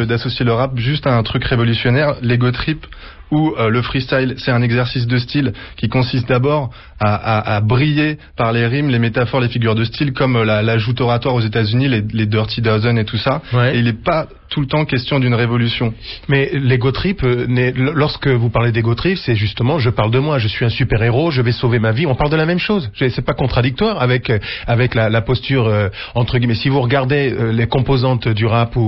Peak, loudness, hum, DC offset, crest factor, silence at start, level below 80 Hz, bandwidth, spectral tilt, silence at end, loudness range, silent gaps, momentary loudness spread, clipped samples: -2 dBFS; -16 LUFS; none; 0.2%; 12 dB; 0 s; -34 dBFS; 5.8 kHz; -10 dB/octave; 0 s; 1 LU; none; 4 LU; under 0.1%